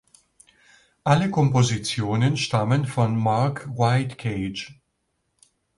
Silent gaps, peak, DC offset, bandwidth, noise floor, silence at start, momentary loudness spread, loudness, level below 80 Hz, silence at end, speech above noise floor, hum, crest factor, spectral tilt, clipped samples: none; -4 dBFS; under 0.1%; 11.5 kHz; -74 dBFS; 1.05 s; 9 LU; -23 LUFS; -54 dBFS; 1.05 s; 52 dB; none; 20 dB; -6 dB/octave; under 0.1%